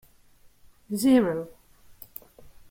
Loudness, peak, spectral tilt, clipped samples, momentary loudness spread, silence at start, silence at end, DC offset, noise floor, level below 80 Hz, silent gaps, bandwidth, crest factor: -24 LUFS; -10 dBFS; -5.5 dB/octave; under 0.1%; 23 LU; 0.9 s; 0.2 s; under 0.1%; -56 dBFS; -60 dBFS; none; 16.5 kHz; 18 dB